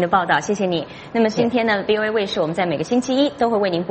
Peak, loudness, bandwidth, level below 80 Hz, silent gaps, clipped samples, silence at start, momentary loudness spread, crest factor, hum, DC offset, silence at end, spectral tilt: -2 dBFS; -19 LUFS; 8.8 kHz; -54 dBFS; none; under 0.1%; 0 s; 4 LU; 18 dB; none; under 0.1%; 0 s; -5 dB/octave